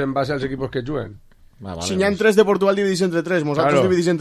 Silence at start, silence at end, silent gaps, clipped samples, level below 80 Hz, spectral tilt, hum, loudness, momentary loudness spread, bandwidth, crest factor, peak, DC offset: 0 s; 0 s; none; under 0.1%; -46 dBFS; -5.5 dB/octave; none; -19 LUFS; 12 LU; 14 kHz; 18 dB; -2 dBFS; under 0.1%